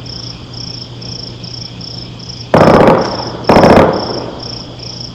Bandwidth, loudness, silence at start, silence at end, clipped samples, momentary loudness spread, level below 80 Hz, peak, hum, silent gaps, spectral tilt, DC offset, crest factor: 15 kHz; -9 LUFS; 0 s; 0 s; 3%; 19 LU; -34 dBFS; 0 dBFS; none; none; -6.5 dB/octave; under 0.1%; 12 dB